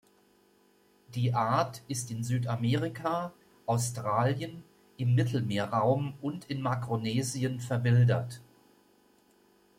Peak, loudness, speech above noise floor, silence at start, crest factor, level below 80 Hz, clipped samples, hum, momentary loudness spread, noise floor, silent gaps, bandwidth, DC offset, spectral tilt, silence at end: -14 dBFS; -30 LUFS; 36 dB; 1.1 s; 18 dB; -66 dBFS; under 0.1%; none; 10 LU; -65 dBFS; none; 15.5 kHz; under 0.1%; -6 dB/octave; 1.35 s